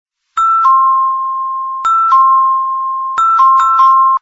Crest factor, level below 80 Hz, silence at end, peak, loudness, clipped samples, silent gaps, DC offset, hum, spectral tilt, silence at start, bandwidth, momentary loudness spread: 10 dB; -58 dBFS; 0.05 s; 0 dBFS; -10 LUFS; under 0.1%; none; under 0.1%; none; 1 dB/octave; 0.35 s; 7.6 kHz; 9 LU